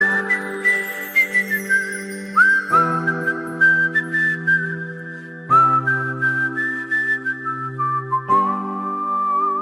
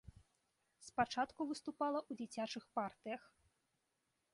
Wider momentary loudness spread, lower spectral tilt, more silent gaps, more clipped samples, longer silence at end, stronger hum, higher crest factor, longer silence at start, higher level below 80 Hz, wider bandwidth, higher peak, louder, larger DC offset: about the same, 11 LU vs 10 LU; about the same, -5 dB/octave vs -4 dB/octave; neither; neither; second, 0 s vs 1.15 s; neither; second, 16 dB vs 22 dB; about the same, 0 s vs 0.05 s; first, -66 dBFS vs -74 dBFS; first, 16 kHz vs 11.5 kHz; first, -4 dBFS vs -22 dBFS; first, -18 LUFS vs -43 LUFS; neither